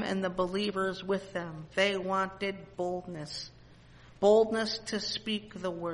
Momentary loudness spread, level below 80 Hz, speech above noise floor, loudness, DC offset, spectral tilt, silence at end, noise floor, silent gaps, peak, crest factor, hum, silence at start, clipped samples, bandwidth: 14 LU; -60 dBFS; 24 dB; -31 LUFS; under 0.1%; -4.5 dB/octave; 0 s; -55 dBFS; none; -12 dBFS; 18 dB; none; 0 s; under 0.1%; 11.5 kHz